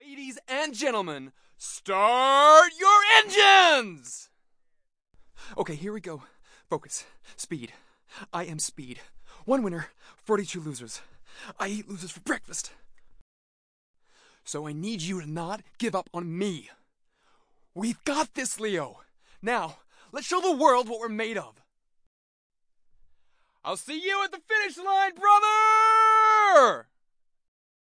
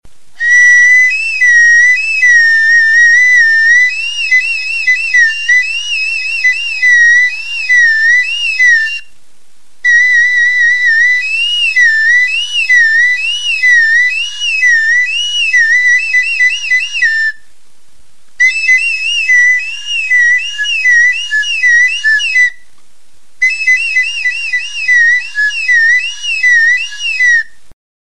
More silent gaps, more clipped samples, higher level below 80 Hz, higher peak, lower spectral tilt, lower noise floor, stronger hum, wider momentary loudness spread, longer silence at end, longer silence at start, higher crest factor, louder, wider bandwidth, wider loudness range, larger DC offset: first, 13.21-13.94 s, 22.07-22.50 s vs none; neither; second, -64 dBFS vs -56 dBFS; about the same, -2 dBFS vs 0 dBFS; first, -2.5 dB/octave vs 5 dB/octave; first, -69 dBFS vs -53 dBFS; neither; first, 23 LU vs 8 LU; first, 1 s vs 0.35 s; about the same, 0.1 s vs 0 s; first, 24 dB vs 10 dB; second, -22 LUFS vs -7 LUFS; about the same, 10.5 kHz vs 11 kHz; first, 18 LU vs 5 LU; second, under 0.1% vs 4%